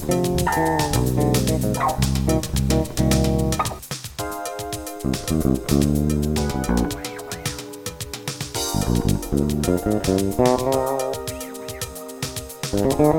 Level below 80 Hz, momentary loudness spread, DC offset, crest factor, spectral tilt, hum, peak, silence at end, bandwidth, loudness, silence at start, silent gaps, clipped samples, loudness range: -32 dBFS; 11 LU; under 0.1%; 18 dB; -5.5 dB/octave; none; -4 dBFS; 0 s; 17 kHz; -22 LUFS; 0 s; none; under 0.1%; 4 LU